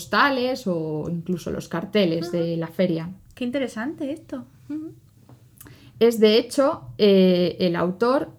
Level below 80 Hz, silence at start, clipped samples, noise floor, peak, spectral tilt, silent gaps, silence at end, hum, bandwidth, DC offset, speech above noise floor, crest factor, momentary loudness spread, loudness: -58 dBFS; 0 s; under 0.1%; -51 dBFS; -4 dBFS; -6 dB/octave; none; 0.05 s; none; 16.5 kHz; under 0.1%; 29 dB; 18 dB; 17 LU; -22 LUFS